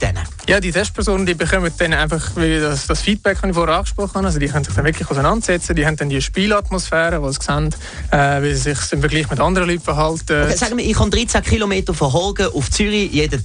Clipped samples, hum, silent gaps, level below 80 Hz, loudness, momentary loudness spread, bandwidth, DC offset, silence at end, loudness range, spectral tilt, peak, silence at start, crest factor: under 0.1%; none; none; -26 dBFS; -17 LUFS; 3 LU; 10 kHz; under 0.1%; 0 s; 1 LU; -4.5 dB/octave; -4 dBFS; 0 s; 14 dB